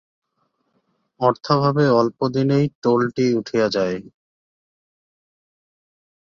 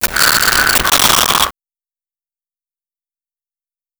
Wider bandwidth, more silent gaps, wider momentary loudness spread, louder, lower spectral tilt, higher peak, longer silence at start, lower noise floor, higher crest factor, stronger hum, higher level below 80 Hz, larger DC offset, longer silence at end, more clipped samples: second, 7.4 kHz vs over 20 kHz; first, 2.75-2.82 s vs none; about the same, 5 LU vs 4 LU; second, -19 LUFS vs -10 LUFS; first, -7 dB/octave vs 0 dB/octave; about the same, -2 dBFS vs 0 dBFS; first, 1.2 s vs 0 s; second, -70 dBFS vs under -90 dBFS; about the same, 18 dB vs 16 dB; neither; second, -60 dBFS vs -38 dBFS; neither; second, 2.2 s vs 2.5 s; neither